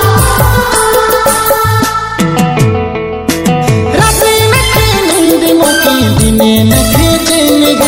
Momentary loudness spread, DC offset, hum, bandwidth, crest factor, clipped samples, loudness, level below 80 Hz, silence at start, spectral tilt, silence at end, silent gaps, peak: 5 LU; under 0.1%; none; over 20 kHz; 8 dB; 1%; -8 LUFS; -22 dBFS; 0 s; -4.5 dB/octave; 0 s; none; 0 dBFS